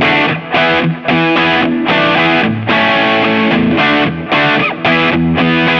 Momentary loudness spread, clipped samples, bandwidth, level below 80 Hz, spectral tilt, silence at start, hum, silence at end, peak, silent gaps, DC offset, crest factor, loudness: 3 LU; under 0.1%; 7 kHz; -42 dBFS; -6.5 dB/octave; 0 s; none; 0 s; 0 dBFS; none; under 0.1%; 12 dB; -11 LUFS